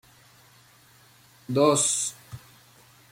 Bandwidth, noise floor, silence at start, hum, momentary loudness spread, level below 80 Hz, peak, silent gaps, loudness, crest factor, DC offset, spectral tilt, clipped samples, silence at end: 16.5 kHz; -56 dBFS; 1.5 s; none; 25 LU; -68 dBFS; -8 dBFS; none; -23 LUFS; 22 dB; under 0.1%; -3.5 dB/octave; under 0.1%; 0.75 s